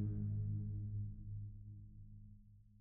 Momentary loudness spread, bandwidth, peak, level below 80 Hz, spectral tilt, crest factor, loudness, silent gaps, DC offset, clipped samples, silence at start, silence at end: 20 LU; 0.8 kHz; -30 dBFS; -56 dBFS; -16 dB/octave; 14 dB; -45 LUFS; none; under 0.1%; under 0.1%; 0 s; 0 s